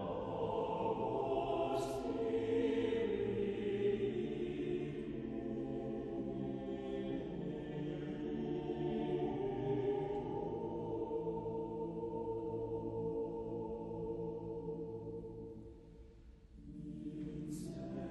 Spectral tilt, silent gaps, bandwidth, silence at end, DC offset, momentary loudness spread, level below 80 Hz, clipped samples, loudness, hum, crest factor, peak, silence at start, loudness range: -7.5 dB/octave; none; 10.5 kHz; 0 s; under 0.1%; 10 LU; -60 dBFS; under 0.1%; -40 LUFS; none; 14 dB; -26 dBFS; 0 s; 9 LU